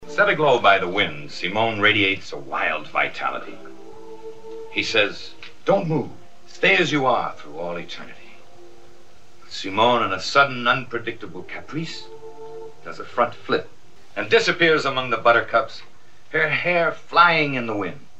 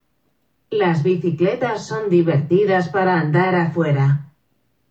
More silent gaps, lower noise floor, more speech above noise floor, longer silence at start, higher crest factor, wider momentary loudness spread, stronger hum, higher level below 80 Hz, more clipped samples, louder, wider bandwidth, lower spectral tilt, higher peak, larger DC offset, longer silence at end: neither; second, -52 dBFS vs -67 dBFS; second, 31 dB vs 50 dB; second, 0 s vs 0.7 s; first, 22 dB vs 14 dB; first, 21 LU vs 6 LU; neither; about the same, -62 dBFS vs -66 dBFS; neither; about the same, -20 LUFS vs -18 LUFS; first, 8.8 kHz vs 7.8 kHz; second, -4.5 dB/octave vs -8 dB/octave; about the same, -2 dBFS vs -4 dBFS; first, 2% vs under 0.1%; second, 0.2 s vs 0.65 s